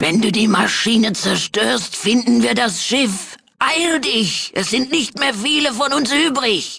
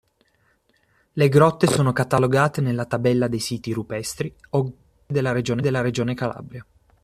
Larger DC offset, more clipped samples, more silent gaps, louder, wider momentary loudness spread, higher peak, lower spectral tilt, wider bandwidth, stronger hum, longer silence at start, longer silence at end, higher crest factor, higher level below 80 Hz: neither; neither; neither; first, -16 LUFS vs -22 LUFS; second, 4 LU vs 13 LU; about the same, -2 dBFS vs -2 dBFS; second, -3 dB/octave vs -6 dB/octave; second, 11 kHz vs 14.5 kHz; neither; second, 0 s vs 1.15 s; second, 0 s vs 0.4 s; about the same, 16 dB vs 20 dB; about the same, -56 dBFS vs -54 dBFS